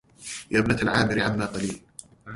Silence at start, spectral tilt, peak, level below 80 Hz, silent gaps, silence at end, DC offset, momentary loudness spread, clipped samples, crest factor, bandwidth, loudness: 0.2 s; -5 dB/octave; -6 dBFS; -48 dBFS; none; 0 s; under 0.1%; 18 LU; under 0.1%; 20 dB; 11.5 kHz; -24 LUFS